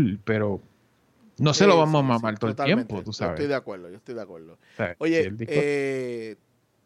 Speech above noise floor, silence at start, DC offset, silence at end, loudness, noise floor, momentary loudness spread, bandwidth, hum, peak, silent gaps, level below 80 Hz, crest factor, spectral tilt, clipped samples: 39 dB; 0 s; under 0.1%; 0.5 s; -24 LUFS; -63 dBFS; 19 LU; 11 kHz; none; -4 dBFS; none; -60 dBFS; 20 dB; -6 dB/octave; under 0.1%